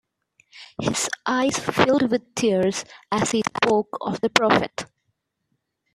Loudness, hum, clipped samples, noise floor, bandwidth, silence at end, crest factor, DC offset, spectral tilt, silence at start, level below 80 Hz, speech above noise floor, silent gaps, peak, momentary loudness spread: -22 LUFS; none; under 0.1%; -75 dBFS; 14.5 kHz; 1.1 s; 24 dB; under 0.1%; -4 dB/octave; 0.55 s; -58 dBFS; 53 dB; none; 0 dBFS; 11 LU